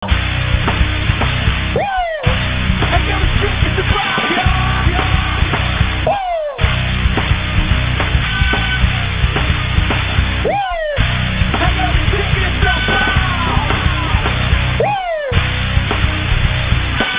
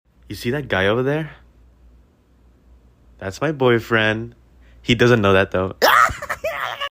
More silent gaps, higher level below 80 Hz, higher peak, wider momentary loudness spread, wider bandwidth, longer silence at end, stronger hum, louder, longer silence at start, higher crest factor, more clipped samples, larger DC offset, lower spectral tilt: neither; first, -20 dBFS vs -46 dBFS; about the same, 0 dBFS vs -2 dBFS; second, 2 LU vs 17 LU; second, 4 kHz vs 16 kHz; about the same, 0 s vs 0 s; neither; first, -15 LUFS vs -18 LUFS; second, 0 s vs 0.3 s; about the same, 14 dB vs 18 dB; neither; neither; first, -9.5 dB/octave vs -5.5 dB/octave